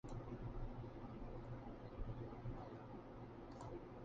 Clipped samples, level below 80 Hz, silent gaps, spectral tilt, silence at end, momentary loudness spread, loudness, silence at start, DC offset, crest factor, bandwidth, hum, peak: under 0.1%; -56 dBFS; none; -8 dB/octave; 0 s; 4 LU; -53 LUFS; 0.05 s; under 0.1%; 16 dB; 7.4 kHz; none; -36 dBFS